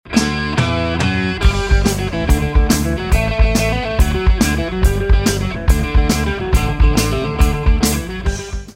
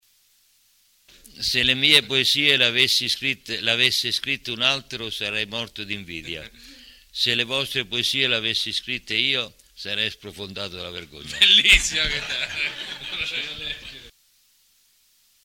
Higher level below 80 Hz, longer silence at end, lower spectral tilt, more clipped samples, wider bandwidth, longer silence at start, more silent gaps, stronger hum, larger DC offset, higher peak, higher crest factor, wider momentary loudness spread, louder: first, -16 dBFS vs -44 dBFS; second, 0.05 s vs 1.35 s; first, -5 dB/octave vs -1.5 dB/octave; neither; about the same, 16.5 kHz vs 17 kHz; second, 0.05 s vs 1.35 s; neither; neither; neither; about the same, 0 dBFS vs -2 dBFS; second, 14 dB vs 22 dB; second, 3 LU vs 18 LU; first, -16 LUFS vs -20 LUFS